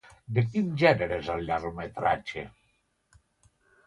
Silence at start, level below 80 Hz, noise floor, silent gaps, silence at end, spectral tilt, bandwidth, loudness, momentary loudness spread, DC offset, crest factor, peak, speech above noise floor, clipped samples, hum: 0.3 s; -54 dBFS; -72 dBFS; none; 1.4 s; -7.5 dB/octave; 11 kHz; -28 LUFS; 14 LU; under 0.1%; 22 dB; -8 dBFS; 44 dB; under 0.1%; none